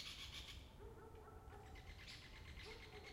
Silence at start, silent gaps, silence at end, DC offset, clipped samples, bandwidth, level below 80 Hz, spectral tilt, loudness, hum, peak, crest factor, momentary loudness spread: 0 s; none; 0 s; under 0.1%; under 0.1%; 16 kHz; -62 dBFS; -3.5 dB/octave; -56 LUFS; none; -40 dBFS; 18 dB; 8 LU